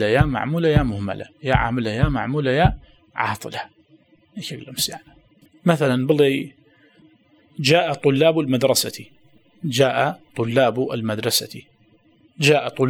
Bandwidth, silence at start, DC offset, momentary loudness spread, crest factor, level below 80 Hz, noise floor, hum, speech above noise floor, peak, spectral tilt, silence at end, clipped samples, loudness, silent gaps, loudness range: 20 kHz; 0 s; under 0.1%; 16 LU; 20 dB; -38 dBFS; -57 dBFS; none; 37 dB; 0 dBFS; -5 dB/octave; 0 s; under 0.1%; -20 LUFS; none; 5 LU